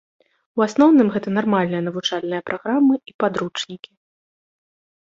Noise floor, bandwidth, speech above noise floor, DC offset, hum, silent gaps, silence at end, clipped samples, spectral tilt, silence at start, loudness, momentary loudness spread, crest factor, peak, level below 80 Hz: under -90 dBFS; 7.8 kHz; over 71 dB; under 0.1%; none; 3.14-3.19 s; 1.3 s; under 0.1%; -6 dB/octave; 0.55 s; -20 LUFS; 14 LU; 18 dB; -4 dBFS; -64 dBFS